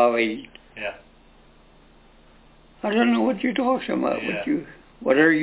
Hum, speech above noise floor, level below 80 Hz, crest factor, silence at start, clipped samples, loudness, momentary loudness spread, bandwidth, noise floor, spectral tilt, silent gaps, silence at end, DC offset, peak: none; 30 dB; -58 dBFS; 18 dB; 0 s; under 0.1%; -23 LUFS; 14 LU; 4 kHz; -52 dBFS; -9 dB/octave; none; 0 s; under 0.1%; -6 dBFS